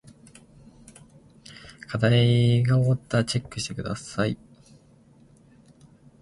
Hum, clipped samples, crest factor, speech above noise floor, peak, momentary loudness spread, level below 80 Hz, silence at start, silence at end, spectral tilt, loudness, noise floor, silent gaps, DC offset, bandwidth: none; under 0.1%; 20 dB; 33 dB; -6 dBFS; 23 LU; -54 dBFS; 1.5 s; 1.85 s; -6 dB/octave; -24 LUFS; -55 dBFS; none; under 0.1%; 11.5 kHz